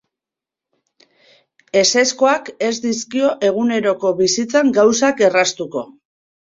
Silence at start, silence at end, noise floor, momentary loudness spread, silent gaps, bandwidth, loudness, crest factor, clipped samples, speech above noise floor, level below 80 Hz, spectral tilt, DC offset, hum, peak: 1.75 s; 0.65 s; -87 dBFS; 8 LU; none; 7.8 kHz; -16 LUFS; 16 dB; under 0.1%; 71 dB; -62 dBFS; -2.5 dB/octave; under 0.1%; none; -2 dBFS